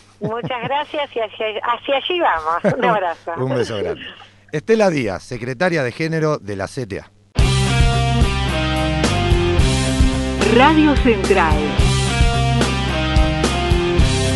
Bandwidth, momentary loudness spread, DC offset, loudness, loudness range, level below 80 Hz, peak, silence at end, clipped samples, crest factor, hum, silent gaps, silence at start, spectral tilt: 11.5 kHz; 11 LU; under 0.1%; -18 LUFS; 5 LU; -24 dBFS; 0 dBFS; 0 s; under 0.1%; 16 dB; none; none; 0.2 s; -5.5 dB/octave